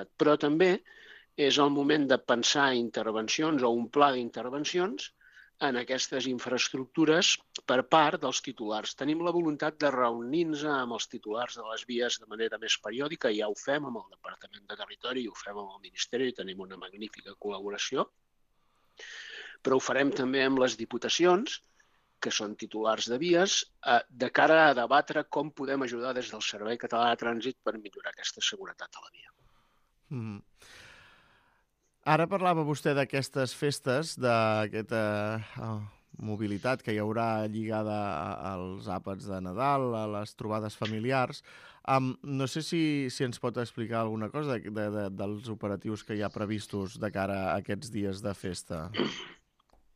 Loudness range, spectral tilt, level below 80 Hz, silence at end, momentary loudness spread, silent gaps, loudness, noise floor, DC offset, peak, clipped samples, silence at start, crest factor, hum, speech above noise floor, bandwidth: 9 LU; -4 dB/octave; -70 dBFS; 0.6 s; 15 LU; none; -30 LUFS; -73 dBFS; under 0.1%; -8 dBFS; under 0.1%; 0 s; 22 dB; none; 43 dB; 15 kHz